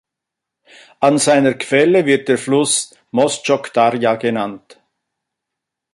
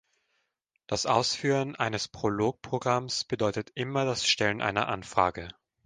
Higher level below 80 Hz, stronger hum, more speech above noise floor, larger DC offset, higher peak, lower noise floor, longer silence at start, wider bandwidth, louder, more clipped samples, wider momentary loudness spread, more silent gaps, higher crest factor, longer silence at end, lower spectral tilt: second, -64 dBFS vs -58 dBFS; neither; first, 67 dB vs 49 dB; neither; first, -2 dBFS vs -8 dBFS; first, -82 dBFS vs -78 dBFS; about the same, 1 s vs 0.9 s; first, 11.5 kHz vs 10 kHz; first, -15 LUFS vs -28 LUFS; neither; about the same, 6 LU vs 7 LU; neither; second, 16 dB vs 22 dB; first, 1.35 s vs 0.35 s; about the same, -4 dB/octave vs -4 dB/octave